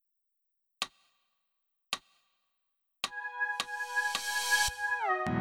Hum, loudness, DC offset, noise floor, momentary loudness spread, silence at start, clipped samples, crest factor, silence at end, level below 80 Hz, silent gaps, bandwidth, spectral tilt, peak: none; -32 LUFS; under 0.1%; -81 dBFS; 12 LU; 0.8 s; under 0.1%; 20 dB; 0 s; -60 dBFS; none; over 20 kHz; -1.5 dB/octave; -16 dBFS